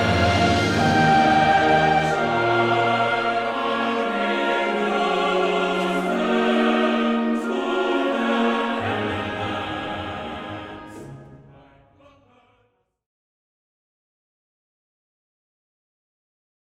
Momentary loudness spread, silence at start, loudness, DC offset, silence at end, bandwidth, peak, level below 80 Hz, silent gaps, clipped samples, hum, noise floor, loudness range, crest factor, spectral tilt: 13 LU; 0 s; -21 LUFS; under 0.1%; 5.3 s; 13 kHz; -6 dBFS; -48 dBFS; none; under 0.1%; none; -67 dBFS; 14 LU; 18 dB; -5.5 dB/octave